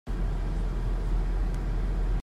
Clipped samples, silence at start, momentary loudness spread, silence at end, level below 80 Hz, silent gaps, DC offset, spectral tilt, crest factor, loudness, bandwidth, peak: under 0.1%; 0.05 s; 1 LU; 0 s; -28 dBFS; none; under 0.1%; -7.5 dB/octave; 10 dB; -32 LUFS; 6 kHz; -18 dBFS